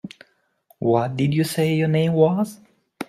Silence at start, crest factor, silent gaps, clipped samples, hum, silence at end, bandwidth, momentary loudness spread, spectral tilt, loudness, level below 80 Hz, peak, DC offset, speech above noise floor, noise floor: 0.05 s; 18 dB; none; under 0.1%; none; 0.05 s; 15.5 kHz; 8 LU; -7 dB/octave; -21 LUFS; -60 dBFS; -4 dBFS; under 0.1%; 41 dB; -60 dBFS